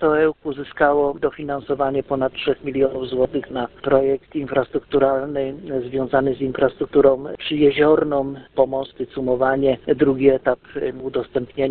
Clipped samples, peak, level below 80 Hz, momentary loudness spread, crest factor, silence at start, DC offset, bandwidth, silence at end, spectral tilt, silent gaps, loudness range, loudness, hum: under 0.1%; -2 dBFS; -48 dBFS; 10 LU; 18 dB; 0 s; under 0.1%; 4.4 kHz; 0 s; -11 dB/octave; none; 3 LU; -20 LUFS; none